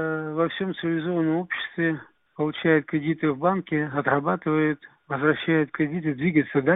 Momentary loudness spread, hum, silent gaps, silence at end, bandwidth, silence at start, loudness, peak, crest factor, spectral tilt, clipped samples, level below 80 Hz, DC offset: 6 LU; none; none; 0 s; 4 kHz; 0 s; -25 LUFS; -6 dBFS; 18 dB; -11.5 dB/octave; under 0.1%; -64 dBFS; under 0.1%